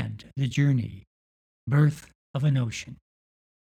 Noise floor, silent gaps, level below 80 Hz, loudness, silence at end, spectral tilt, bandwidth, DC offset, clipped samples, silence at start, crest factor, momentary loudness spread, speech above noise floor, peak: under -90 dBFS; 1.07-1.67 s, 2.15-2.34 s; -58 dBFS; -26 LUFS; 0.8 s; -7 dB/octave; 9.2 kHz; under 0.1%; under 0.1%; 0 s; 18 dB; 17 LU; over 66 dB; -10 dBFS